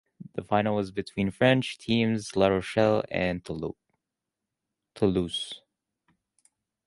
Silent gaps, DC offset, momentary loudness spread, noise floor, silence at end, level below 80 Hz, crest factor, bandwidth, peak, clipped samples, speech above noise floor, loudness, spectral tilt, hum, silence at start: none; under 0.1%; 13 LU; -87 dBFS; 1.3 s; -54 dBFS; 22 dB; 11.5 kHz; -8 dBFS; under 0.1%; 60 dB; -27 LUFS; -6 dB/octave; none; 0.2 s